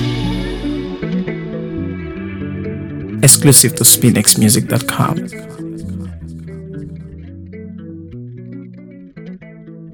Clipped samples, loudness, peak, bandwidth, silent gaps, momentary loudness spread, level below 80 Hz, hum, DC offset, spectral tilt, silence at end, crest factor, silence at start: 0.4%; -12 LUFS; 0 dBFS; over 20 kHz; none; 25 LU; -38 dBFS; none; under 0.1%; -3.5 dB/octave; 0 s; 16 dB; 0 s